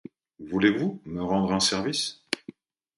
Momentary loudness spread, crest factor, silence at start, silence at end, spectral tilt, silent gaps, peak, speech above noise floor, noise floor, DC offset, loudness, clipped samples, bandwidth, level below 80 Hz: 10 LU; 22 dB; 0.4 s; 0.6 s; -4 dB/octave; none; -6 dBFS; 23 dB; -48 dBFS; under 0.1%; -26 LUFS; under 0.1%; 11.5 kHz; -56 dBFS